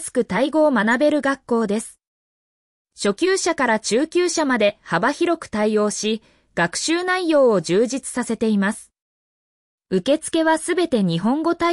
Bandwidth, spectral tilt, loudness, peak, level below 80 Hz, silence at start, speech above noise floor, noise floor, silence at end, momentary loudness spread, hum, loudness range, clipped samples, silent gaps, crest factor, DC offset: 12 kHz; -4.5 dB/octave; -20 LUFS; -6 dBFS; -58 dBFS; 0 s; over 71 dB; under -90 dBFS; 0 s; 7 LU; none; 2 LU; under 0.1%; 2.07-2.85 s, 9.02-9.78 s; 14 dB; under 0.1%